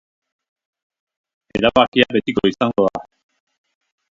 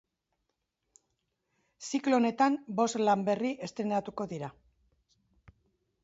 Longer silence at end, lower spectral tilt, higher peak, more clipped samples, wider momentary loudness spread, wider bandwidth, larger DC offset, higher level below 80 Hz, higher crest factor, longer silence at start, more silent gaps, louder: second, 1.1 s vs 1.5 s; about the same, -6 dB/octave vs -5 dB/octave; first, 0 dBFS vs -14 dBFS; neither; second, 9 LU vs 12 LU; about the same, 7.6 kHz vs 8 kHz; neither; first, -50 dBFS vs -72 dBFS; about the same, 20 dB vs 18 dB; second, 1.55 s vs 1.8 s; first, 1.88-1.92 s vs none; first, -17 LUFS vs -30 LUFS